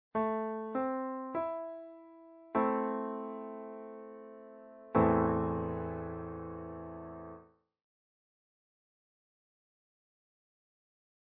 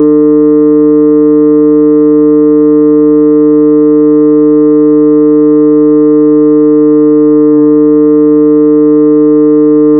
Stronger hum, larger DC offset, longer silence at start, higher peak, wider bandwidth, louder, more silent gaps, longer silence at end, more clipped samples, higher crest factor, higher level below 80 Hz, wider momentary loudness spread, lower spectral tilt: neither; second, under 0.1% vs 0.6%; first, 0.15 s vs 0 s; second, -16 dBFS vs 0 dBFS; first, 4 kHz vs 2.1 kHz; second, -35 LUFS vs -5 LUFS; neither; first, 3.9 s vs 0 s; neither; first, 22 dB vs 4 dB; about the same, -58 dBFS vs -60 dBFS; first, 22 LU vs 0 LU; second, -8.5 dB/octave vs -15 dB/octave